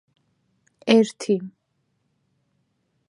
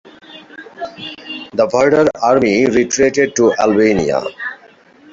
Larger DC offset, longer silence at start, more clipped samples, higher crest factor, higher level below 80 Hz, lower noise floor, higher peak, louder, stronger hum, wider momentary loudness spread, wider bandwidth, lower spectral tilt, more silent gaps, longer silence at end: neither; first, 0.85 s vs 0.3 s; neither; first, 24 dB vs 14 dB; second, -80 dBFS vs -48 dBFS; first, -72 dBFS vs -45 dBFS; about the same, -2 dBFS vs 0 dBFS; second, -21 LUFS vs -13 LUFS; neither; about the same, 16 LU vs 17 LU; first, 11 kHz vs 7.8 kHz; about the same, -5 dB/octave vs -4.5 dB/octave; neither; first, 1.6 s vs 0.55 s